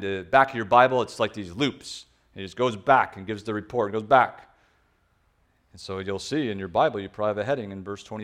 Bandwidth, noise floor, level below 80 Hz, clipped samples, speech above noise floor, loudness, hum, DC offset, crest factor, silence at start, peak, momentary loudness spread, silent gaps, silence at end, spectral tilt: 12 kHz; -66 dBFS; -60 dBFS; under 0.1%; 42 dB; -24 LUFS; none; under 0.1%; 22 dB; 0 s; -4 dBFS; 16 LU; none; 0 s; -5 dB/octave